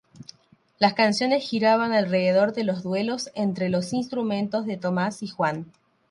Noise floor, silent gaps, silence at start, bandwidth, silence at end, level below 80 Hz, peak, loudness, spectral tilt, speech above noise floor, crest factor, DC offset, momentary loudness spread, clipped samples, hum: -60 dBFS; none; 0.2 s; 11.5 kHz; 0.45 s; -68 dBFS; -4 dBFS; -24 LUFS; -5.5 dB/octave; 37 dB; 20 dB; under 0.1%; 7 LU; under 0.1%; none